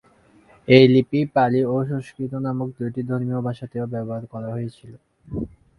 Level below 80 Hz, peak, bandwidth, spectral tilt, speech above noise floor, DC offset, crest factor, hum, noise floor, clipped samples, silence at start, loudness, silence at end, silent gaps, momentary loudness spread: -52 dBFS; 0 dBFS; 11 kHz; -8.5 dB/octave; 34 dB; under 0.1%; 22 dB; none; -54 dBFS; under 0.1%; 0.7 s; -21 LUFS; 0.3 s; none; 17 LU